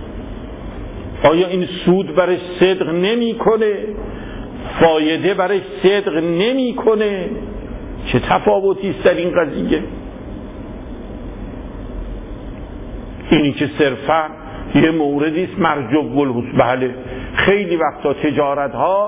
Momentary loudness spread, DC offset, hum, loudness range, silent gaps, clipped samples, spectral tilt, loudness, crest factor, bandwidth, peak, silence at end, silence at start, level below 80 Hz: 16 LU; under 0.1%; none; 6 LU; none; under 0.1%; -10.5 dB/octave; -16 LUFS; 16 dB; 4 kHz; -2 dBFS; 0 s; 0 s; -36 dBFS